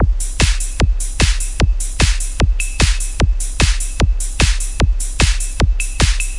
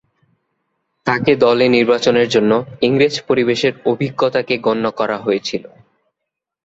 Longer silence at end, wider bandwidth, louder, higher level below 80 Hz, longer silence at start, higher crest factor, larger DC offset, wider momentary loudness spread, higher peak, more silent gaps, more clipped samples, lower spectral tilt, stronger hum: second, 0 s vs 1 s; first, 11.5 kHz vs 8 kHz; about the same, -17 LUFS vs -16 LUFS; first, -16 dBFS vs -56 dBFS; second, 0 s vs 1.05 s; about the same, 14 dB vs 16 dB; neither; second, 2 LU vs 7 LU; about the same, 0 dBFS vs 0 dBFS; neither; neither; second, -3.5 dB/octave vs -5.5 dB/octave; neither